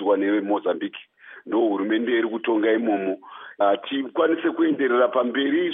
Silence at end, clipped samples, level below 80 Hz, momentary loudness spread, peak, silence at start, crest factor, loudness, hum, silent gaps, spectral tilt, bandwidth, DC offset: 0 s; under 0.1%; -86 dBFS; 9 LU; -8 dBFS; 0 s; 14 dB; -22 LUFS; none; none; -2.5 dB/octave; 3.8 kHz; under 0.1%